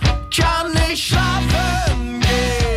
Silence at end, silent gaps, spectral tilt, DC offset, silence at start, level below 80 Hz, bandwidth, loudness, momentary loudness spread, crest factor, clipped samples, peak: 0 s; none; -4.5 dB/octave; under 0.1%; 0 s; -22 dBFS; 16 kHz; -18 LUFS; 2 LU; 14 dB; under 0.1%; -2 dBFS